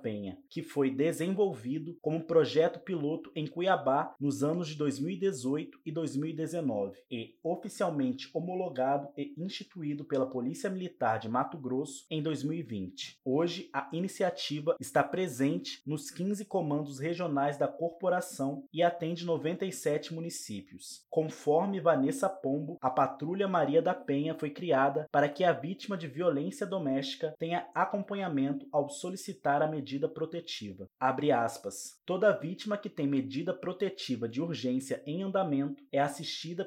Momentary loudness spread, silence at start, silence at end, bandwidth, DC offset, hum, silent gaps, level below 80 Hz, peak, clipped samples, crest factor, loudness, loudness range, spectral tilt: 10 LU; 0 s; 0 s; 16 kHz; under 0.1%; none; none; -82 dBFS; -12 dBFS; under 0.1%; 20 dB; -33 LUFS; 4 LU; -5.5 dB/octave